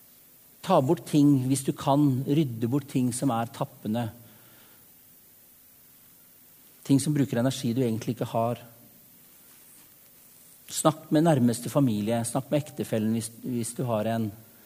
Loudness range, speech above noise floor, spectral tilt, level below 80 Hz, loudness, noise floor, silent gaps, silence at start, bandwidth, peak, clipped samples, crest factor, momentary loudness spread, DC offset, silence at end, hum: 8 LU; 30 dB; -6.5 dB/octave; -66 dBFS; -26 LUFS; -55 dBFS; none; 0.65 s; 15.5 kHz; -6 dBFS; under 0.1%; 22 dB; 9 LU; under 0.1%; 0.25 s; none